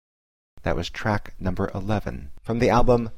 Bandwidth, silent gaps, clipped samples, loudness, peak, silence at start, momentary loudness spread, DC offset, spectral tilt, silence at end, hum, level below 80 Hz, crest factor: 10.5 kHz; none; under 0.1%; -25 LUFS; -8 dBFS; 0.65 s; 12 LU; 0.7%; -7 dB/octave; 0 s; none; -32 dBFS; 16 dB